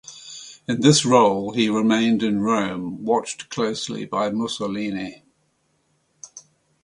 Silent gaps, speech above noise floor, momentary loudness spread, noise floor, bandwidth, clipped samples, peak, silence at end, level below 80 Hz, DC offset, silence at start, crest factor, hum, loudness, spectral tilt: none; 47 dB; 20 LU; -67 dBFS; 11.5 kHz; under 0.1%; -2 dBFS; 0.45 s; -60 dBFS; under 0.1%; 0.1 s; 20 dB; none; -21 LUFS; -4.5 dB/octave